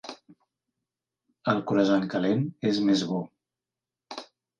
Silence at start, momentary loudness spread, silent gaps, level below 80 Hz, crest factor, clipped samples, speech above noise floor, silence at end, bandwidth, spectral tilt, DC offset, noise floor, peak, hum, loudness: 0.05 s; 18 LU; none; -72 dBFS; 18 dB; under 0.1%; 65 dB; 0.35 s; 9.4 kHz; -6.5 dB/octave; under 0.1%; -90 dBFS; -10 dBFS; none; -26 LUFS